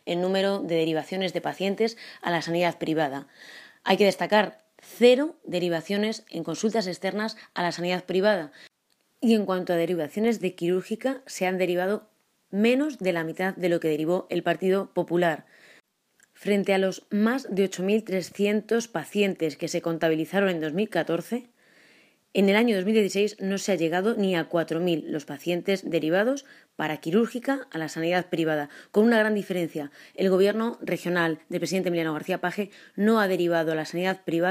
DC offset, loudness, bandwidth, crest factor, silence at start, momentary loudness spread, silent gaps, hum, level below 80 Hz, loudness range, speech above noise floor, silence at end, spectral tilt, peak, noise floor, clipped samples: under 0.1%; -26 LUFS; 15.5 kHz; 20 dB; 0.05 s; 9 LU; none; none; -78 dBFS; 3 LU; 45 dB; 0 s; -5.5 dB/octave; -6 dBFS; -71 dBFS; under 0.1%